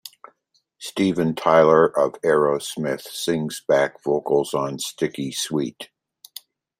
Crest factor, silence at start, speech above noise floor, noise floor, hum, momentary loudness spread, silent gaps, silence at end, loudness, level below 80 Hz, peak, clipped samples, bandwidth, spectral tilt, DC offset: 20 dB; 0.05 s; 47 dB; -68 dBFS; none; 24 LU; none; 0.95 s; -21 LUFS; -64 dBFS; -2 dBFS; under 0.1%; 16 kHz; -4.5 dB/octave; under 0.1%